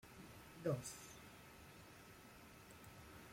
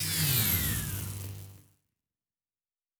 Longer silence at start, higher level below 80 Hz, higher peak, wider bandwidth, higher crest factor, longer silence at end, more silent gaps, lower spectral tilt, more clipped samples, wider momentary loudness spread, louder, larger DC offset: about the same, 0 s vs 0 s; second, -72 dBFS vs -48 dBFS; second, -30 dBFS vs -12 dBFS; second, 16.5 kHz vs over 20 kHz; about the same, 22 dB vs 20 dB; second, 0 s vs 1.4 s; neither; first, -5 dB/octave vs -2.5 dB/octave; neither; about the same, 16 LU vs 17 LU; second, -52 LUFS vs -28 LUFS; neither